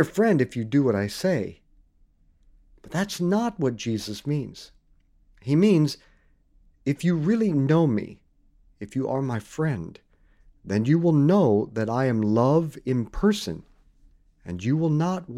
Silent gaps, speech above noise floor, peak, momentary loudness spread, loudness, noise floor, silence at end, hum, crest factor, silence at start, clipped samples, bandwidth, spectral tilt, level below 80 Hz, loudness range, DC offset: none; 37 dB; -6 dBFS; 14 LU; -24 LUFS; -60 dBFS; 0 s; none; 18 dB; 0 s; under 0.1%; 14.5 kHz; -7 dB/octave; -50 dBFS; 7 LU; under 0.1%